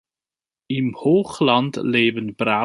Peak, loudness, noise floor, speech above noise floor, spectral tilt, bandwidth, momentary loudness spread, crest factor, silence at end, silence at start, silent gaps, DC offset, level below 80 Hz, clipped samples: -2 dBFS; -20 LUFS; under -90 dBFS; over 71 dB; -6 dB/octave; 11.5 kHz; 6 LU; 18 dB; 0 s; 0.7 s; none; under 0.1%; -62 dBFS; under 0.1%